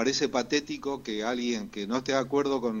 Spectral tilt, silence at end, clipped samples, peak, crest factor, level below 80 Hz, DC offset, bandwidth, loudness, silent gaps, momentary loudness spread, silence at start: -3.5 dB/octave; 0 s; under 0.1%; -12 dBFS; 16 dB; -60 dBFS; under 0.1%; 16 kHz; -29 LUFS; none; 6 LU; 0 s